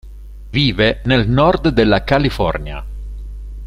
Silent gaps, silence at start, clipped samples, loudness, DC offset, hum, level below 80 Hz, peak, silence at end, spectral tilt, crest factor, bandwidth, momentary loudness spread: none; 0.05 s; under 0.1%; -15 LUFS; under 0.1%; 50 Hz at -25 dBFS; -28 dBFS; -2 dBFS; 0 s; -7 dB/octave; 16 dB; 13 kHz; 18 LU